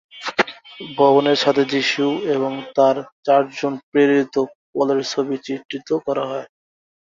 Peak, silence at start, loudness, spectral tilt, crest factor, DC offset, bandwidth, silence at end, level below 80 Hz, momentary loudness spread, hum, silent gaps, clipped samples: -2 dBFS; 0.15 s; -19 LUFS; -4.5 dB/octave; 18 dB; under 0.1%; 7.6 kHz; 0.65 s; -68 dBFS; 11 LU; none; 3.12-3.23 s, 3.83-3.92 s, 4.55-4.73 s, 5.65-5.69 s; under 0.1%